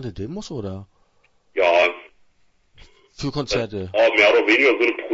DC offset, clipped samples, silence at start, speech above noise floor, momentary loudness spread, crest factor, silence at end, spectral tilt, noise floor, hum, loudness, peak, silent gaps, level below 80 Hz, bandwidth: under 0.1%; under 0.1%; 0 s; 40 dB; 17 LU; 18 dB; 0 s; -4.5 dB/octave; -60 dBFS; none; -18 LUFS; -2 dBFS; none; -50 dBFS; 8 kHz